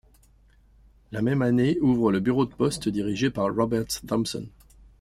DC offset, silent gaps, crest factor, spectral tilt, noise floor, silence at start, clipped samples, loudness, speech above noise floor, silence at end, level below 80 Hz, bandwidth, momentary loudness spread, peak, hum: under 0.1%; none; 16 dB; -6 dB/octave; -57 dBFS; 1.1 s; under 0.1%; -25 LUFS; 33 dB; 0.5 s; -52 dBFS; 15.5 kHz; 8 LU; -10 dBFS; none